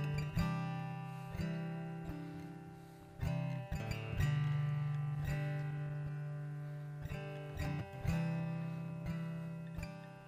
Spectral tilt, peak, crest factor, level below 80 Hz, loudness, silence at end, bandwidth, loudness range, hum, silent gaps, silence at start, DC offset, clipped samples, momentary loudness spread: -7.5 dB/octave; -22 dBFS; 18 dB; -54 dBFS; -41 LUFS; 0 s; 15.5 kHz; 4 LU; none; none; 0 s; under 0.1%; under 0.1%; 9 LU